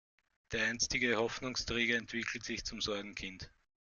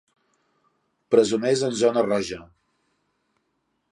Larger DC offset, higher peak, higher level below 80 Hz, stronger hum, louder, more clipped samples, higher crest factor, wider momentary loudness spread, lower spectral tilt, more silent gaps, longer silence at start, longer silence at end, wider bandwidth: neither; second, -18 dBFS vs -4 dBFS; about the same, -58 dBFS vs -62 dBFS; neither; second, -35 LUFS vs -22 LUFS; neither; about the same, 20 dB vs 22 dB; about the same, 12 LU vs 10 LU; second, -2.5 dB/octave vs -4.5 dB/octave; neither; second, 0.5 s vs 1.1 s; second, 0.4 s vs 1.45 s; second, 10 kHz vs 11.5 kHz